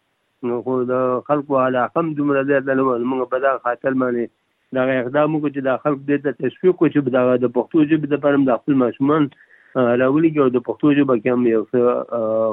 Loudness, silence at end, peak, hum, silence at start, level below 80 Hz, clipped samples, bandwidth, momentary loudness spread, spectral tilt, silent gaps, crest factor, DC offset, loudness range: -19 LUFS; 0 s; -4 dBFS; none; 0.4 s; -72 dBFS; under 0.1%; 3.9 kHz; 5 LU; -11 dB/octave; none; 14 dB; under 0.1%; 3 LU